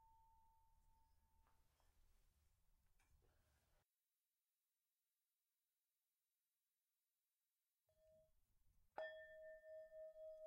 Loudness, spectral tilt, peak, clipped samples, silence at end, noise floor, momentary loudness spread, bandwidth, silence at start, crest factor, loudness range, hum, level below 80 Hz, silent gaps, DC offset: -59 LUFS; -3.5 dB/octave; -38 dBFS; under 0.1%; 0 s; under -90 dBFS; 6 LU; 16 kHz; 0 s; 30 dB; 3 LU; none; -84 dBFS; none; under 0.1%